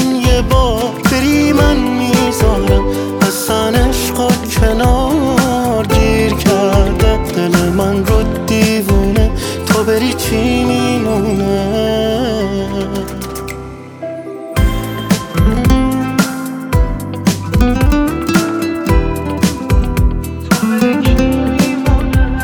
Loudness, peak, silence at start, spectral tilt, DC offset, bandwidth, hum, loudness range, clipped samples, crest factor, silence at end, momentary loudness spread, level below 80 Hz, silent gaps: -14 LUFS; 0 dBFS; 0 s; -5.5 dB/octave; under 0.1%; 20 kHz; none; 4 LU; under 0.1%; 12 dB; 0 s; 7 LU; -18 dBFS; none